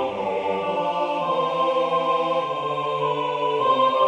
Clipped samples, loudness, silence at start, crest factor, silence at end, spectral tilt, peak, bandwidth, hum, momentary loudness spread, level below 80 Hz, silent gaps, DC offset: under 0.1%; -23 LUFS; 0 s; 14 dB; 0 s; -5.5 dB/octave; -8 dBFS; 9.6 kHz; none; 5 LU; -68 dBFS; none; under 0.1%